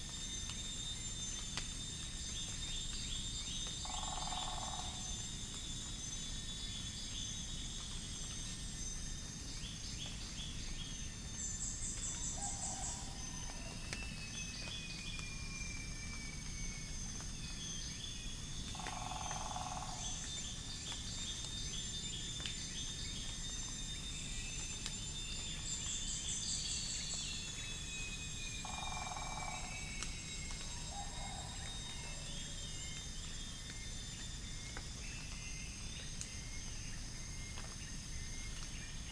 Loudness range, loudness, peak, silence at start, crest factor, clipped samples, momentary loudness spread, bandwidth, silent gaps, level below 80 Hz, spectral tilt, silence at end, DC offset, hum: 5 LU; -43 LUFS; -20 dBFS; 0 s; 24 dB; under 0.1%; 6 LU; 10.5 kHz; none; -50 dBFS; -2 dB/octave; 0 s; under 0.1%; none